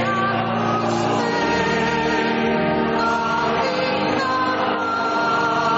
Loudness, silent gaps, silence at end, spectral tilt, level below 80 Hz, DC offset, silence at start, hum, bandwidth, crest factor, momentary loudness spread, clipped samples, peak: -20 LUFS; none; 0 s; -3.5 dB/octave; -48 dBFS; under 0.1%; 0 s; none; 8 kHz; 12 dB; 2 LU; under 0.1%; -8 dBFS